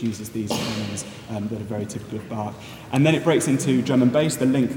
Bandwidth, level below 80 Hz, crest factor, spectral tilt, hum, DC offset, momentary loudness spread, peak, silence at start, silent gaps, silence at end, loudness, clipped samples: 18.5 kHz; -58 dBFS; 18 dB; -5.5 dB/octave; none; under 0.1%; 13 LU; -4 dBFS; 0 s; none; 0 s; -23 LUFS; under 0.1%